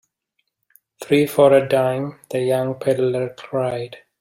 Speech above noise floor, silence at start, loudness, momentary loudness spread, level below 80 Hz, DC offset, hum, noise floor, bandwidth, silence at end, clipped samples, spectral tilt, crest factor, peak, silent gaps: 55 dB; 1 s; -19 LUFS; 13 LU; -62 dBFS; under 0.1%; none; -73 dBFS; 16 kHz; 0.2 s; under 0.1%; -6.5 dB/octave; 18 dB; -2 dBFS; none